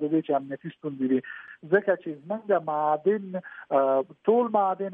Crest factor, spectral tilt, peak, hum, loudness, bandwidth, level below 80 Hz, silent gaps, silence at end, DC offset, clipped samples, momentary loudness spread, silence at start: 18 dB; -10.5 dB/octave; -8 dBFS; none; -26 LUFS; 3.8 kHz; -82 dBFS; none; 0 s; under 0.1%; under 0.1%; 13 LU; 0 s